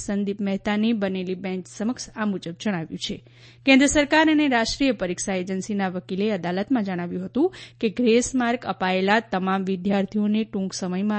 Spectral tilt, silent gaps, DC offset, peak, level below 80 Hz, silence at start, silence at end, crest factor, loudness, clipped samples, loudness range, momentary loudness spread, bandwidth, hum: -4.5 dB/octave; none; under 0.1%; -4 dBFS; -50 dBFS; 0 s; 0 s; 18 dB; -23 LUFS; under 0.1%; 5 LU; 11 LU; 8.8 kHz; none